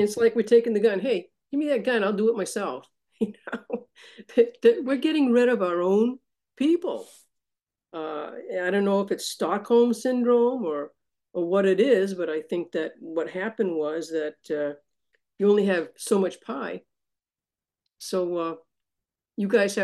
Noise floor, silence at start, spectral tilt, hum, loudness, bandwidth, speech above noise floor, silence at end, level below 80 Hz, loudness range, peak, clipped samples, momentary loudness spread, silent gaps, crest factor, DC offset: under -90 dBFS; 0 s; -5.5 dB/octave; none; -25 LUFS; 12.5 kHz; over 66 dB; 0 s; -76 dBFS; 6 LU; -6 dBFS; under 0.1%; 13 LU; none; 18 dB; under 0.1%